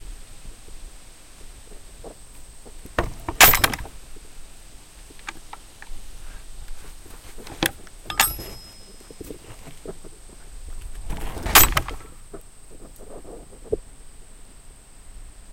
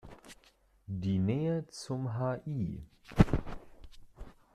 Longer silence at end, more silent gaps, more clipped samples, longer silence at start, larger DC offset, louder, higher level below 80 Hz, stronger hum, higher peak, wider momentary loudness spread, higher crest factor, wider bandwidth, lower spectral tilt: second, 0 s vs 0.25 s; neither; neither; about the same, 0 s vs 0.05 s; neither; first, -19 LUFS vs -33 LUFS; first, -36 dBFS vs -44 dBFS; neither; first, 0 dBFS vs -6 dBFS; first, 31 LU vs 25 LU; about the same, 26 dB vs 28 dB; first, 17 kHz vs 13 kHz; second, -1.5 dB/octave vs -7.5 dB/octave